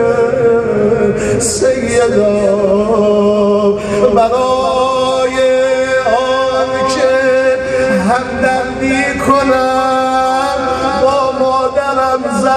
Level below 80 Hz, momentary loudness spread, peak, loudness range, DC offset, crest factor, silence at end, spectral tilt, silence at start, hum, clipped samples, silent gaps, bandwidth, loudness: -38 dBFS; 3 LU; 0 dBFS; 1 LU; under 0.1%; 12 dB; 0 s; -4.5 dB/octave; 0 s; none; under 0.1%; none; 13 kHz; -12 LUFS